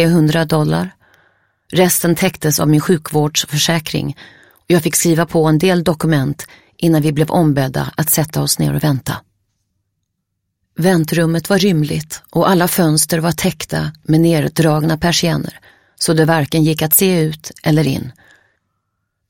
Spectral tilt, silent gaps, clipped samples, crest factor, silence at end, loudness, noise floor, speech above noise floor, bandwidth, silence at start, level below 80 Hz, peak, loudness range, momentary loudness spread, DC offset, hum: -5 dB/octave; none; under 0.1%; 16 dB; 1.2 s; -15 LUFS; -73 dBFS; 58 dB; 17 kHz; 0 s; -46 dBFS; 0 dBFS; 4 LU; 9 LU; under 0.1%; none